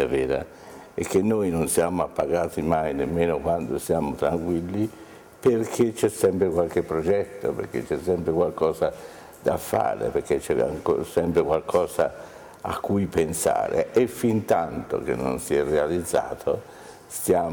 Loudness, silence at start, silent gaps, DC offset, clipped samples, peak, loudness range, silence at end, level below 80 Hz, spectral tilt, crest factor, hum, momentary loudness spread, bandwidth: -25 LUFS; 0 s; none; under 0.1%; under 0.1%; -8 dBFS; 2 LU; 0 s; -50 dBFS; -6 dB/octave; 16 dB; none; 8 LU; over 20 kHz